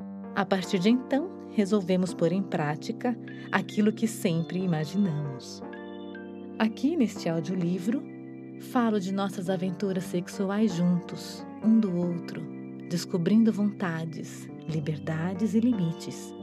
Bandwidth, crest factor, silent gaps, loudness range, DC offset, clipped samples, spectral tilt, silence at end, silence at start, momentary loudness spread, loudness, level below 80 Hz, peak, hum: 14 kHz; 22 dB; none; 3 LU; under 0.1%; under 0.1%; -6.5 dB/octave; 0 s; 0 s; 15 LU; -28 LUFS; -76 dBFS; -6 dBFS; none